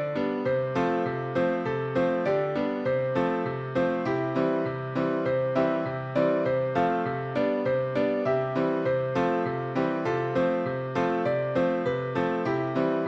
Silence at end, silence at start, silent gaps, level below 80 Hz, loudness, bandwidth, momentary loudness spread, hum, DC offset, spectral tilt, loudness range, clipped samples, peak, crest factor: 0 s; 0 s; none; -62 dBFS; -27 LUFS; 7.6 kHz; 3 LU; none; under 0.1%; -8 dB/octave; 1 LU; under 0.1%; -12 dBFS; 14 dB